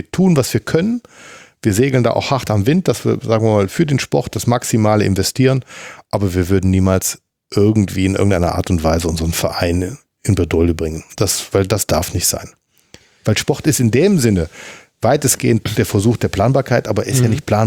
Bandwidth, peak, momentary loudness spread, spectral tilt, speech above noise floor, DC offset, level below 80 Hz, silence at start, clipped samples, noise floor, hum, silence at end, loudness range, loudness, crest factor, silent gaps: 19 kHz; 0 dBFS; 7 LU; -5.5 dB/octave; 32 dB; under 0.1%; -40 dBFS; 0.15 s; under 0.1%; -47 dBFS; none; 0 s; 2 LU; -16 LUFS; 14 dB; none